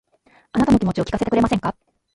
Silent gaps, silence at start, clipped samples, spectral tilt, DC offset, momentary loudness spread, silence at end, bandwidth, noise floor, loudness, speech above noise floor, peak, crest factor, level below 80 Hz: none; 0.55 s; under 0.1%; -7 dB/octave; under 0.1%; 8 LU; 0.4 s; 11.5 kHz; -57 dBFS; -20 LUFS; 38 dB; -4 dBFS; 16 dB; -40 dBFS